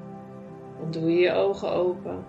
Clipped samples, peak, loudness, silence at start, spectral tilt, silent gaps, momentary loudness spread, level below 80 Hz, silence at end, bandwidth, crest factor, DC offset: under 0.1%; -10 dBFS; -25 LUFS; 0 s; -7.5 dB/octave; none; 20 LU; -66 dBFS; 0 s; 7.6 kHz; 16 dB; under 0.1%